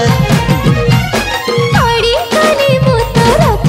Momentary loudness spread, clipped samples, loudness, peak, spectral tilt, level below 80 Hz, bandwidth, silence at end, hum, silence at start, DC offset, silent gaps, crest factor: 3 LU; under 0.1%; -10 LUFS; 0 dBFS; -5.5 dB/octave; -24 dBFS; 16.5 kHz; 0 s; none; 0 s; under 0.1%; none; 10 dB